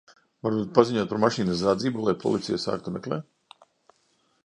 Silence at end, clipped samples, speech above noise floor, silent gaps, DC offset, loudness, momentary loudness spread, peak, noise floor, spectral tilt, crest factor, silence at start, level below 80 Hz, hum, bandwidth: 1.25 s; under 0.1%; 43 dB; none; under 0.1%; -26 LUFS; 10 LU; 0 dBFS; -68 dBFS; -6 dB/octave; 26 dB; 0.45 s; -60 dBFS; none; 10.5 kHz